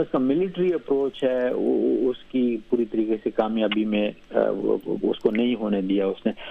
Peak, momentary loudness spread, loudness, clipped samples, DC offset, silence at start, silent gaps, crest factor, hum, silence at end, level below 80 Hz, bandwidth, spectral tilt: -6 dBFS; 3 LU; -24 LUFS; under 0.1%; under 0.1%; 0 s; none; 18 dB; none; 0 s; -56 dBFS; 5.4 kHz; -8.5 dB/octave